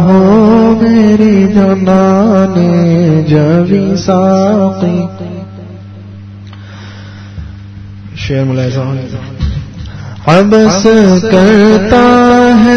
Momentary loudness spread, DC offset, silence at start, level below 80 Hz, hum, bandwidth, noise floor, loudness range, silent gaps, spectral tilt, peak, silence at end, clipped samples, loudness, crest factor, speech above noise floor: 23 LU; under 0.1%; 0 s; -30 dBFS; 50 Hz at -25 dBFS; 7.2 kHz; -27 dBFS; 13 LU; none; -7 dB/octave; 0 dBFS; 0 s; 2%; -8 LUFS; 8 dB; 20 dB